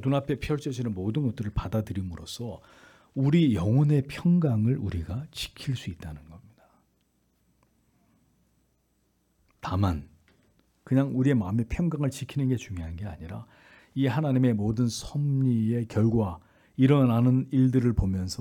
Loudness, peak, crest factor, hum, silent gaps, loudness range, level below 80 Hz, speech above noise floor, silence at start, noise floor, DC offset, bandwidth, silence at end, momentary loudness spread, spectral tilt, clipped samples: -27 LUFS; -10 dBFS; 18 dB; none; none; 11 LU; -48 dBFS; 45 dB; 0 s; -71 dBFS; under 0.1%; 14.5 kHz; 0.05 s; 15 LU; -7.5 dB/octave; under 0.1%